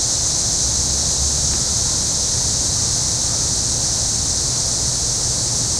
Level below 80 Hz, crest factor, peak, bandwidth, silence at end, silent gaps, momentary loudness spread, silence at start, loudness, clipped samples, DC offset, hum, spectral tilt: -32 dBFS; 14 dB; -6 dBFS; 16 kHz; 0 s; none; 1 LU; 0 s; -16 LUFS; under 0.1%; under 0.1%; none; -1.5 dB/octave